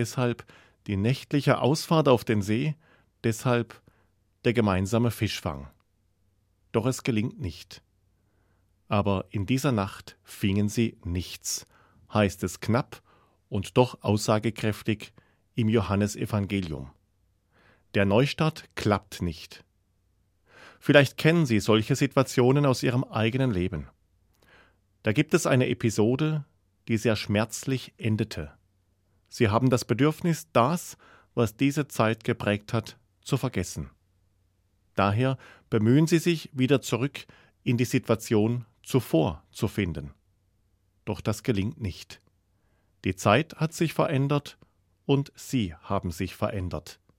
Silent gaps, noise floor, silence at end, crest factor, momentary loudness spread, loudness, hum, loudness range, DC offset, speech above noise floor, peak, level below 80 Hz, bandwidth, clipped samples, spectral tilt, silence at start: none; -69 dBFS; 0.25 s; 22 dB; 14 LU; -26 LUFS; none; 5 LU; under 0.1%; 44 dB; -4 dBFS; -56 dBFS; 16.5 kHz; under 0.1%; -6 dB/octave; 0 s